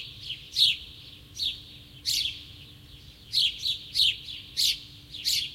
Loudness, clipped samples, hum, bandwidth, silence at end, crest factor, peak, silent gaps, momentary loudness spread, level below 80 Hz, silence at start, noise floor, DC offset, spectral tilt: -26 LUFS; under 0.1%; none; 16.5 kHz; 0 s; 22 dB; -8 dBFS; none; 21 LU; -56 dBFS; 0 s; -49 dBFS; under 0.1%; 1 dB/octave